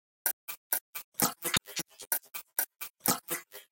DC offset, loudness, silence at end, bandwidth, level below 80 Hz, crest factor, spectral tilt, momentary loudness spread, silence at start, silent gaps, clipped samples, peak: under 0.1%; -32 LUFS; 0.1 s; 17 kHz; -68 dBFS; 28 dB; -1.5 dB/octave; 9 LU; 0.25 s; 0.33-0.47 s, 0.57-0.70 s, 0.81-0.93 s, 1.04-1.12 s, 2.07-2.11 s, 2.90-2.94 s; under 0.1%; -8 dBFS